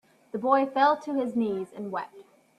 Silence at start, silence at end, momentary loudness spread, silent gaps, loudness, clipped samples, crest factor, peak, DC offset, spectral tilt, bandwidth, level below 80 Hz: 0.35 s; 0.35 s; 13 LU; none; -27 LUFS; under 0.1%; 20 dB; -8 dBFS; under 0.1%; -6.5 dB/octave; 12 kHz; -76 dBFS